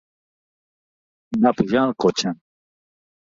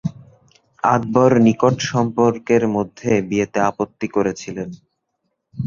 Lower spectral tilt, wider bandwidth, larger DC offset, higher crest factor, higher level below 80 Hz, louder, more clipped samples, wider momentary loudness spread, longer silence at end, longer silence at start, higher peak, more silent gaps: second, -5 dB/octave vs -6.5 dB/octave; about the same, 7.6 kHz vs 7.4 kHz; neither; about the same, 20 dB vs 18 dB; second, -58 dBFS vs -52 dBFS; about the same, -20 LUFS vs -18 LUFS; neither; second, 10 LU vs 15 LU; first, 1 s vs 0 s; first, 1.3 s vs 0.05 s; about the same, -4 dBFS vs -2 dBFS; neither